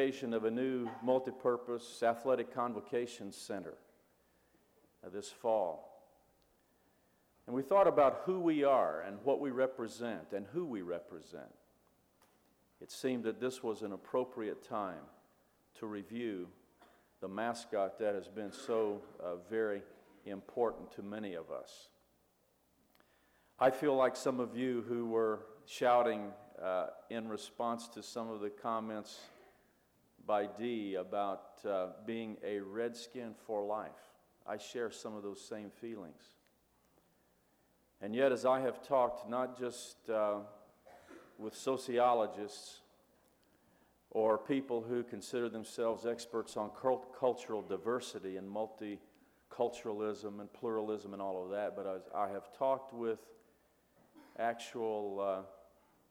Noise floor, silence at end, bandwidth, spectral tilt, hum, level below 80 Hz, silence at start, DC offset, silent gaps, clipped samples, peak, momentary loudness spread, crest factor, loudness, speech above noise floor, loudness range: -74 dBFS; 0.5 s; 16.5 kHz; -5 dB/octave; none; -80 dBFS; 0 s; under 0.1%; none; under 0.1%; -18 dBFS; 16 LU; 20 dB; -38 LUFS; 37 dB; 9 LU